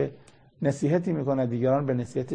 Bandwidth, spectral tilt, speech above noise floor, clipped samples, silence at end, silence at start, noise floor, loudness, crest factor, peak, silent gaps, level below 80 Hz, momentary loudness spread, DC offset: 9.8 kHz; -8.5 dB/octave; 27 dB; under 0.1%; 0 s; 0 s; -52 dBFS; -27 LUFS; 14 dB; -12 dBFS; none; -62 dBFS; 5 LU; under 0.1%